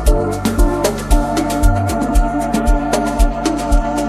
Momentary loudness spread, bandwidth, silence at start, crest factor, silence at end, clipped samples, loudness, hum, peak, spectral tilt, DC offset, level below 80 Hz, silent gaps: 2 LU; 15 kHz; 0 s; 14 dB; 0 s; under 0.1%; -17 LUFS; none; 0 dBFS; -5.5 dB/octave; under 0.1%; -16 dBFS; none